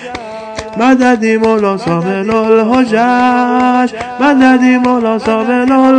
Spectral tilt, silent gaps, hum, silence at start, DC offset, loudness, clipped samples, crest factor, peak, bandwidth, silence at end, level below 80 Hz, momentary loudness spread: -6 dB/octave; none; none; 0 s; under 0.1%; -10 LUFS; 0.3%; 10 dB; 0 dBFS; 9.4 kHz; 0 s; -46 dBFS; 7 LU